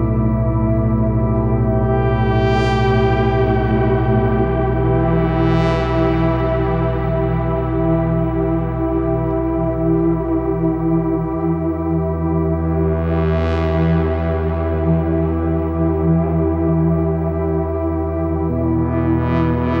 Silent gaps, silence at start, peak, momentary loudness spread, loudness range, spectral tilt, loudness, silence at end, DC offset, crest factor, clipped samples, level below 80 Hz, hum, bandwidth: none; 0 s; -4 dBFS; 4 LU; 2 LU; -9.5 dB/octave; -17 LUFS; 0 s; under 0.1%; 12 dB; under 0.1%; -26 dBFS; none; 6.6 kHz